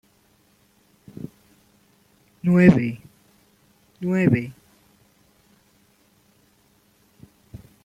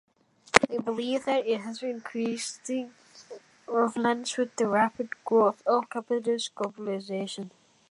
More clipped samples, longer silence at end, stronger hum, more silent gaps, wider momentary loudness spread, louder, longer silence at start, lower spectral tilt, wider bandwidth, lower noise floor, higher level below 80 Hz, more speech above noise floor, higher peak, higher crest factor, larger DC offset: neither; first, 3.35 s vs 0.4 s; neither; neither; first, 31 LU vs 13 LU; first, -20 LUFS vs -28 LUFS; first, 1.2 s vs 0.55 s; first, -9 dB/octave vs -3.5 dB/octave; second, 8.6 kHz vs 11.5 kHz; first, -61 dBFS vs -48 dBFS; first, -54 dBFS vs -66 dBFS; first, 43 dB vs 20 dB; about the same, -2 dBFS vs 0 dBFS; about the same, 24 dB vs 28 dB; neither